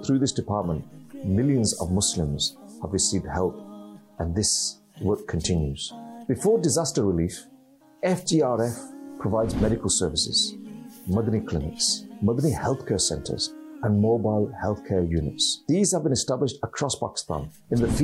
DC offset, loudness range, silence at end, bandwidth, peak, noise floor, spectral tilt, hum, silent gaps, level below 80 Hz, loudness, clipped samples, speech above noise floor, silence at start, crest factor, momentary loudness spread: under 0.1%; 2 LU; 0 s; 16 kHz; -10 dBFS; -54 dBFS; -4.5 dB/octave; none; none; -44 dBFS; -25 LUFS; under 0.1%; 30 dB; 0 s; 16 dB; 11 LU